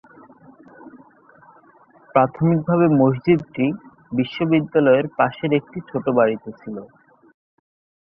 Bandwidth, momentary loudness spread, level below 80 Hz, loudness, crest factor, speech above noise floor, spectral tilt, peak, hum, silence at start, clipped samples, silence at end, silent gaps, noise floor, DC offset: 5.6 kHz; 14 LU; -60 dBFS; -19 LUFS; 20 dB; 33 dB; -10.5 dB/octave; -2 dBFS; none; 0.85 s; under 0.1%; 1.25 s; none; -52 dBFS; under 0.1%